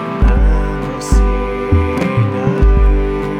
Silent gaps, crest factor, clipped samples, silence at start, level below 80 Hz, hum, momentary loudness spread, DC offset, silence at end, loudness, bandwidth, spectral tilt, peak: none; 12 dB; under 0.1%; 0 s; -14 dBFS; none; 5 LU; under 0.1%; 0 s; -15 LUFS; 9.6 kHz; -7.5 dB/octave; 0 dBFS